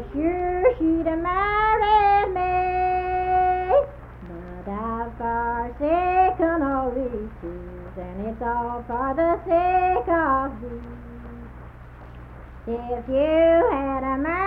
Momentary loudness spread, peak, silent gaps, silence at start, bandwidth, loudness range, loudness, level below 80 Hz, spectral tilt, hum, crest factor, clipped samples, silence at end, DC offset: 21 LU; -6 dBFS; none; 0 s; 5.2 kHz; 5 LU; -22 LUFS; -40 dBFS; -9 dB/octave; none; 16 dB; under 0.1%; 0 s; under 0.1%